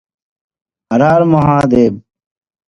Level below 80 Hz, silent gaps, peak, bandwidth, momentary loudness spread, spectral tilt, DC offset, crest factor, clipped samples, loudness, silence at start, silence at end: -42 dBFS; none; 0 dBFS; 11 kHz; 7 LU; -8.5 dB/octave; under 0.1%; 14 dB; under 0.1%; -11 LUFS; 0.9 s; 0.7 s